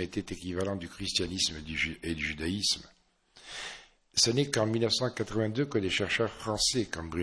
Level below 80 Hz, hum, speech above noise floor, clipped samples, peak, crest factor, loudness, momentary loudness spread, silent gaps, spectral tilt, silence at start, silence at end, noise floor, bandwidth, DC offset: -54 dBFS; none; 29 dB; under 0.1%; -12 dBFS; 20 dB; -30 LUFS; 10 LU; none; -3.5 dB/octave; 0 s; 0 s; -60 dBFS; 11 kHz; under 0.1%